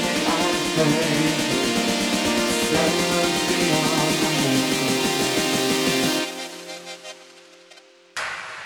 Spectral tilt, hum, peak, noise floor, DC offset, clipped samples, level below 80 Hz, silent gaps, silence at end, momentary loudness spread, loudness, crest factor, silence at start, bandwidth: -3 dB/octave; none; -6 dBFS; -50 dBFS; under 0.1%; under 0.1%; -52 dBFS; none; 0 s; 13 LU; -20 LUFS; 16 dB; 0 s; 19 kHz